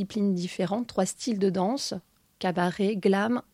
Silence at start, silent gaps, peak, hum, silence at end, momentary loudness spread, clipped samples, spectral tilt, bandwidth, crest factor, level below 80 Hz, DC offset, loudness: 0 s; none; -10 dBFS; none; 0.15 s; 7 LU; under 0.1%; -5.5 dB/octave; 14.5 kHz; 16 dB; -66 dBFS; under 0.1%; -27 LUFS